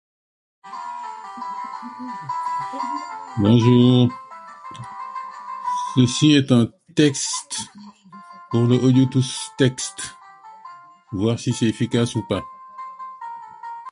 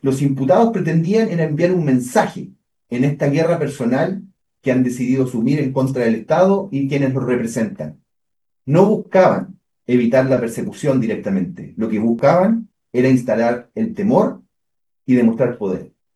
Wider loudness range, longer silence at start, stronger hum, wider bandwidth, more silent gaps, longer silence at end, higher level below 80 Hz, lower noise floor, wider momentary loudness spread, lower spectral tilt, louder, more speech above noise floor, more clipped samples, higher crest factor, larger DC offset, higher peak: first, 6 LU vs 2 LU; first, 0.65 s vs 0.05 s; neither; about the same, 11.5 kHz vs 12.5 kHz; neither; second, 0 s vs 0.3 s; about the same, -54 dBFS vs -58 dBFS; second, -44 dBFS vs -83 dBFS; first, 21 LU vs 10 LU; second, -5.5 dB/octave vs -7.5 dB/octave; second, -20 LUFS vs -17 LUFS; second, 25 dB vs 67 dB; neither; about the same, 20 dB vs 18 dB; neither; about the same, -2 dBFS vs 0 dBFS